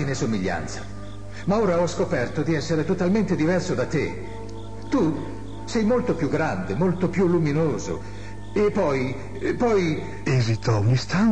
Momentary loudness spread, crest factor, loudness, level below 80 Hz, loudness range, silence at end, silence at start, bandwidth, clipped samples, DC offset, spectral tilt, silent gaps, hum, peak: 14 LU; 12 dB; -24 LUFS; -44 dBFS; 2 LU; 0 s; 0 s; 10 kHz; under 0.1%; 2%; -6.5 dB/octave; none; 50 Hz at -40 dBFS; -10 dBFS